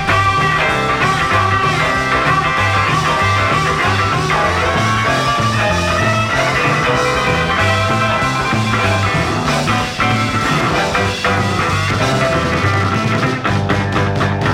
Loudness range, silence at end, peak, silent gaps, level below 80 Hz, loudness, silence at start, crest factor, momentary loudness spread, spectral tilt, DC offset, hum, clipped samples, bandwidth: 2 LU; 0 s; -2 dBFS; none; -34 dBFS; -14 LUFS; 0 s; 12 dB; 2 LU; -5 dB/octave; under 0.1%; none; under 0.1%; 16 kHz